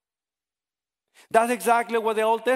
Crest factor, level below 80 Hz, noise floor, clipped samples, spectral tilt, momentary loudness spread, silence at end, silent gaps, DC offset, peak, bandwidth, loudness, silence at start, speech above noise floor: 22 dB; -72 dBFS; under -90 dBFS; under 0.1%; -3 dB/octave; 2 LU; 0 s; none; under 0.1%; -4 dBFS; 16 kHz; -23 LUFS; 1.35 s; over 68 dB